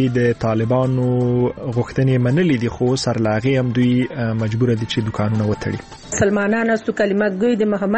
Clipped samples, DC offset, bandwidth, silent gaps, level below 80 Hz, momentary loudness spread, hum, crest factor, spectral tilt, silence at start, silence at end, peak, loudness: under 0.1%; under 0.1%; 8.6 kHz; none; -44 dBFS; 5 LU; none; 14 dB; -6.5 dB/octave; 0 s; 0 s; -4 dBFS; -18 LUFS